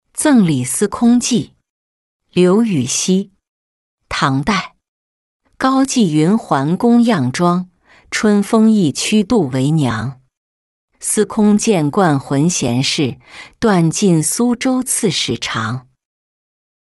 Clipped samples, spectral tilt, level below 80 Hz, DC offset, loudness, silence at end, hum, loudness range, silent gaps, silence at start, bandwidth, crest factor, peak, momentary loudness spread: under 0.1%; -5 dB/octave; -50 dBFS; under 0.1%; -15 LUFS; 1.15 s; none; 3 LU; 1.70-2.20 s, 3.49-3.98 s, 4.88-5.40 s, 10.37-10.88 s; 0.15 s; 12.5 kHz; 14 dB; -2 dBFS; 9 LU